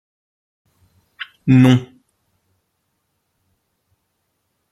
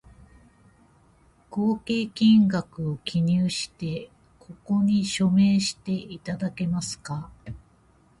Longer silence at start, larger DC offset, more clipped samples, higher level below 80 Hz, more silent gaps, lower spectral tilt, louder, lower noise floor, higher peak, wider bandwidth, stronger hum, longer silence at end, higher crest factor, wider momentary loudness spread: second, 1.2 s vs 1.5 s; neither; neither; about the same, -56 dBFS vs -54 dBFS; neither; first, -7.5 dB/octave vs -5.5 dB/octave; first, -14 LUFS vs -25 LUFS; first, -71 dBFS vs -59 dBFS; first, -2 dBFS vs -10 dBFS; about the same, 11.5 kHz vs 11.5 kHz; neither; first, 2.85 s vs 0.65 s; about the same, 20 dB vs 16 dB; first, 23 LU vs 16 LU